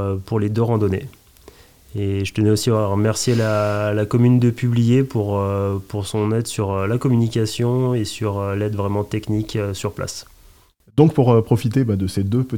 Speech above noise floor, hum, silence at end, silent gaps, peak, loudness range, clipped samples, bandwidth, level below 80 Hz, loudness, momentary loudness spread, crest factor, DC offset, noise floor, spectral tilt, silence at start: 33 dB; none; 0 s; none; 0 dBFS; 4 LU; under 0.1%; 16 kHz; -50 dBFS; -19 LUFS; 9 LU; 18 dB; 0.3%; -51 dBFS; -7 dB/octave; 0 s